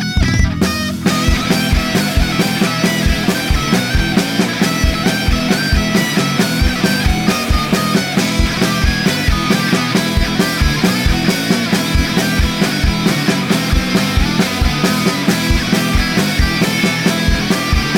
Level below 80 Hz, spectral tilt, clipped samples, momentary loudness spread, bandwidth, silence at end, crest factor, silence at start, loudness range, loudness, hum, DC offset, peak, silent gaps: -22 dBFS; -4.5 dB/octave; under 0.1%; 1 LU; 20 kHz; 0 s; 14 dB; 0 s; 0 LU; -14 LUFS; none; under 0.1%; -2 dBFS; none